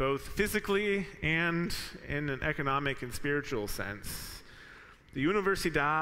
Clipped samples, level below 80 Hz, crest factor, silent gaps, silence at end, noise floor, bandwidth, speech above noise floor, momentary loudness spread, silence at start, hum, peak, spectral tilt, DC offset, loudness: under 0.1%; -48 dBFS; 16 dB; none; 0 s; -54 dBFS; 16 kHz; 22 dB; 13 LU; 0 s; none; -16 dBFS; -5 dB/octave; under 0.1%; -32 LUFS